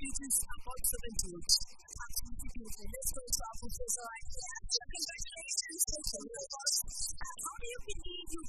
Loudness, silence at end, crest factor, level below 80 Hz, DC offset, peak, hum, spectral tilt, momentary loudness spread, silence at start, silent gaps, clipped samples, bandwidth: -36 LUFS; 0 s; 24 dB; -48 dBFS; under 0.1%; -14 dBFS; none; -0.5 dB/octave; 12 LU; 0 s; none; under 0.1%; 13 kHz